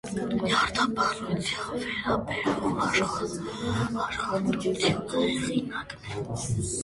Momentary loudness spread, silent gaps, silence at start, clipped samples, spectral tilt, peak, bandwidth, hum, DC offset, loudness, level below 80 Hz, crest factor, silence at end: 8 LU; none; 0.05 s; under 0.1%; -4.5 dB/octave; -10 dBFS; 11.5 kHz; none; under 0.1%; -28 LUFS; -50 dBFS; 18 dB; 0 s